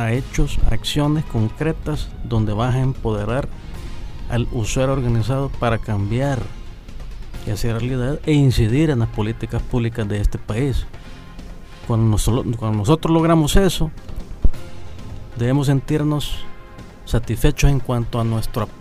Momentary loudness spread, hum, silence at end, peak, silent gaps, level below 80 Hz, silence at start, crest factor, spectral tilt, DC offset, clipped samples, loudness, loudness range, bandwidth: 19 LU; none; 0 s; -2 dBFS; none; -26 dBFS; 0 s; 16 dB; -6.5 dB/octave; under 0.1%; under 0.1%; -20 LUFS; 4 LU; 15.5 kHz